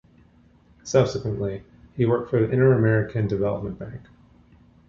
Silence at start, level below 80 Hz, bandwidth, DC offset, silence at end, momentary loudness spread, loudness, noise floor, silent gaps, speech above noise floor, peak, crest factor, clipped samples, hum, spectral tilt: 0.85 s; -50 dBFS; 7.4 kHz; under 0.1%; 0.9 s; 20 LU; -23 LUFS; -56 dBFS; none; 34 dB; -4 dBFS; 20 dB; under 0.1%; none; -7.5 dB/octave